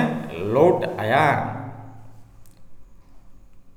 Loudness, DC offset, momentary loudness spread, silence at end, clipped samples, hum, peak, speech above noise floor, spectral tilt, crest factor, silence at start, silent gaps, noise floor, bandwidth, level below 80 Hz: -21 LUFS; under 0.1%; 18 LU; 0.05 s; under 0.1%; none; -4 dBFS; 24 dB; -7 dB/octave; 20 dB; 0 s; none; -43 dBFS; 17.5 kHz; -52 dBFS